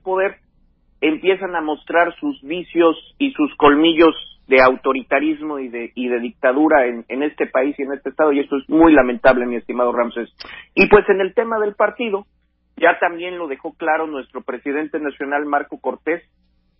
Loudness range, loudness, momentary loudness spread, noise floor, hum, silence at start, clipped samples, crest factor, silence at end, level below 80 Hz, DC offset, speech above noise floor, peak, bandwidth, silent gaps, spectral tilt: 6 LU; -18 LUFS; 14 LU; -57 dBFS; none; 0.05 s; under 0.1%; 18 dB; 0.6 s; -48 dBFS; under 0.1%; 40 dB; 0 dBFS; 5.8 kHz; none; -8.5 dB/octave